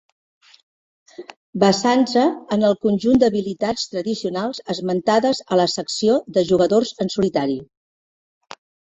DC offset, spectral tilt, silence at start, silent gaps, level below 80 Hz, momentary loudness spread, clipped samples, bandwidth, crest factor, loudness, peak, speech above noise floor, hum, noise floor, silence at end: under 0.1%; -5 dB/octave; 1.2 s; 1.37-1.53 s; -56 dBFS; 9 LU; under 0.1%; 8.4 kHz; 18 dB; -19 LUFS; -2 dBFS; over 71 dB; none; under -90 dBFS; 1.2 s